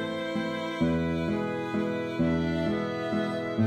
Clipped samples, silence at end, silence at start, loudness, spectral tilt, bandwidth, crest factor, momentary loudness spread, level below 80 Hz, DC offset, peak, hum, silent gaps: under 0.1%; 0 s; 0 s; -29 LUFS; -7.5 dB/octave; 10.5 kHz; 14 dB; 4 LU; -50 dBFS; under 0.1%; -14 dBFS; none; none